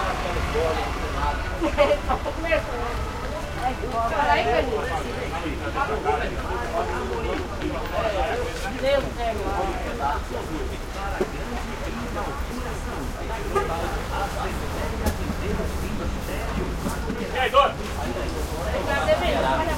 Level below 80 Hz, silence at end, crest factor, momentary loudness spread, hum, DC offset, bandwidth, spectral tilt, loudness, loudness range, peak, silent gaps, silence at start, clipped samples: -32 dBFS; 0 s; 20 dB; 9 LU; none; under 0.1%; 16.5 kHz; -5 dB/octave; -26 LUFS; 4 LU; -6 dBFS; none; 0 s; under 0.1%